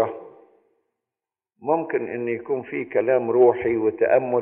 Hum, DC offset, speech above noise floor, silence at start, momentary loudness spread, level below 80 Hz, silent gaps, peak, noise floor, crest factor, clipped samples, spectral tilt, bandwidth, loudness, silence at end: none; under 0.1%; 69 dB; 0 s; 10 LU; -66 dBFS; none; -4 dBFS; -90 dBFS; 18 dB; under 0.1%; -7 dB/octave; 3.4 kHz; -22 LUFS; 0 s